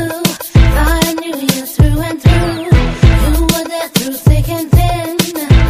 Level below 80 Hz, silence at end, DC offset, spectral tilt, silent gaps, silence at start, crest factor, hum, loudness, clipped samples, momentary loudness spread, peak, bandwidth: -16 dBFS; 0 s; under 0.1%; -5.5 dB/octave; none; 0 s; 10 dB; none; -13 LUFS; 0.1%; 5 LU; 0 dBFS; 16 kHz